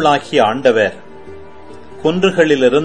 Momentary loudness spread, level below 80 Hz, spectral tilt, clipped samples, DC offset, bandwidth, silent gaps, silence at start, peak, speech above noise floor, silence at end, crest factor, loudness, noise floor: 7 LU; -50 dBFS; -5.5 dB/octave; under 0.1%; 2%; 9.8 kHz; none; 0 s; 0 dBFS; 24 dB; 0 s; 14 dB; -14 LUFS; -37 dBFS